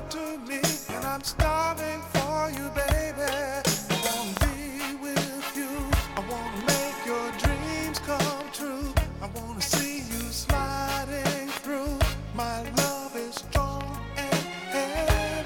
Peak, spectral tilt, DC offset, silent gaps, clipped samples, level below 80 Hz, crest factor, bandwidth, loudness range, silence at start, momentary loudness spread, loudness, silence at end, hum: -8 dBFS; -4 dB/octave; under 0.1%; none; under 0.1%; -36 dBFS; 20 dB; 17.5 kHz; 2 LU; 0 s; 7 LU; -29 LUFS; 0 s; none